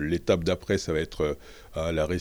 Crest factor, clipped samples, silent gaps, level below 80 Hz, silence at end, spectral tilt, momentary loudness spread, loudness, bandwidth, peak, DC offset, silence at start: 18 dB; under 0.1%; none; -42 dBFS; 0 s; -5.5 dB/octave; 9 LU; -28 LUFS; over 20 kHz; -10 dBFS; under 0.1%; 0 s